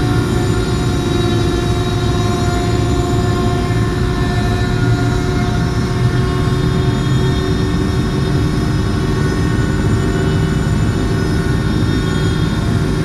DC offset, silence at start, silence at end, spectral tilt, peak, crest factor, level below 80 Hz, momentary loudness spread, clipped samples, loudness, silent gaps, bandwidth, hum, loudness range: under 0.1%; 0 s; 0 s; -6.5 dB/octave; -2 dBFS; 12 dB; -22 dBFS; 1 LU; under 0.1%; -16 LUFS; none; 13.5 kHz; none; 0 LU